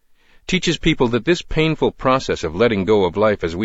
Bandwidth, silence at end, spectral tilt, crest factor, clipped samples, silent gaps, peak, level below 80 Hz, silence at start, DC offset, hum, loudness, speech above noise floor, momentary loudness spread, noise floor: 8 kHz; 0 s; -5.5 dB/octave; 16 dB; under 0.1%; none; -2 dBFS; -36 dBFS; 0.5 s; under 0.1%; none; -18 LUFS; 21 dB; 4 LU; -38 dBFS